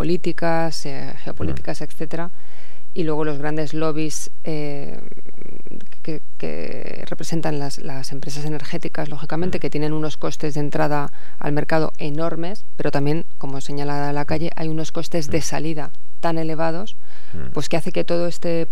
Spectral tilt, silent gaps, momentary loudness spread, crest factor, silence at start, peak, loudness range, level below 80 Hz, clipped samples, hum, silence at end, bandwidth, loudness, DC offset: -5.5 dB/octave; none; 11 LU; 20 dB; 0 s; -2 dBFS; 5 LU; -50 dBFS; under 0.1%; none; 0.05 s; 15 kHz; -26 LUFS; 30%